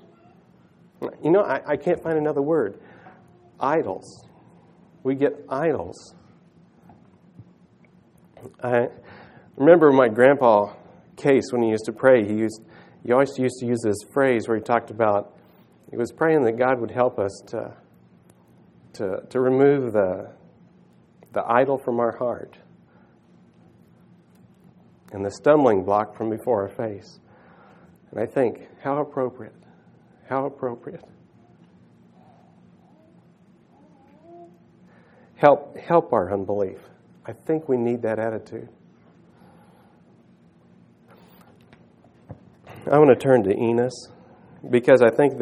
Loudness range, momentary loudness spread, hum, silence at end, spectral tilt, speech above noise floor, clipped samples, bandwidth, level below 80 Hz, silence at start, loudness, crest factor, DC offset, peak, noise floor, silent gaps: 12 LU; 19 LU; none; 0 s; -7 dB/octave; 34 dB; under 0.1%; 12 kHz; -68 dBFS; 1 s; -21 LUFS; 24 dB; under 0.1%; 0 dBFS; -55 dBFS; none